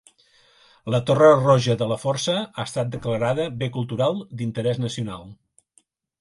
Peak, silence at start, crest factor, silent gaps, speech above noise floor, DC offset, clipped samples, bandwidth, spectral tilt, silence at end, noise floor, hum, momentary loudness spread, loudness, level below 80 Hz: -2 dBFS; 0.85 s; 20 dB; none; 42 dB; under 0.1%; under 0.1%; 11.5 kHz; -6 dB/octave; 0.85 s; -63 dBFS; none; 14 LU; -22 LUFS; -56 dBFS